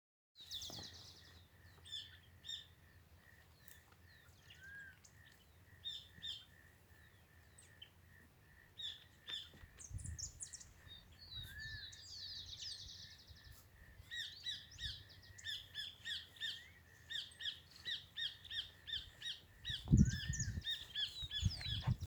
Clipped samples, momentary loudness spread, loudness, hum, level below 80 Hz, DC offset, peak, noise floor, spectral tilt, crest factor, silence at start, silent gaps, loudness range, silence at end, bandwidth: under 0.1%; 23 LU; -45 LUFS; none; -56 dBFS; under 0.1%; -16 dBFS; -66 dBFS; -3.5 dB/octave; 30 dB; 0.35 s; none; 14 LU; 0 s; over 20 kHz